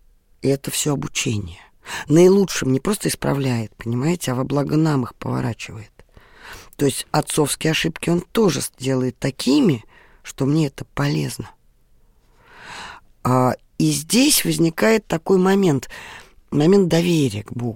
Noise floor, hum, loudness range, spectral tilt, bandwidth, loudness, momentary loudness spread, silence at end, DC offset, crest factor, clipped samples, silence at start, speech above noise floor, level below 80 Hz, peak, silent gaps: -54 dBFS; none; 6 LU; -5 dB/octave; 17 kHz; -19 LUFS; 19 LU; 0 s; under 0.1%; 18 dB; under 0.1%; 0.45 s; 35 dB; -48 dBFS; -2 dBFS; none